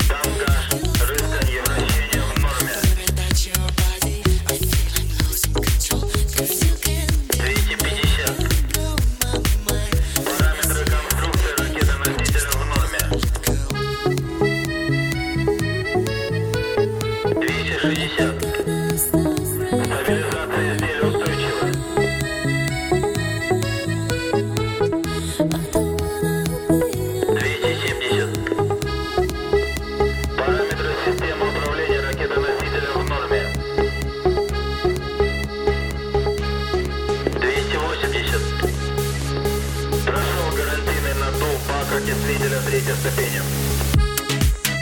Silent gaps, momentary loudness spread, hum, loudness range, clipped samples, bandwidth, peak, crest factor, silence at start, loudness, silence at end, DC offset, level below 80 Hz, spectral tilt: none; 3 LU; none; 2 LU; under 0.1%; over 20 kHz; -4 dBFS; 16 dB; 0 s; -21 LUFS; 0 s; under 0.1%; -26 dBFS; -4.5 dB/octave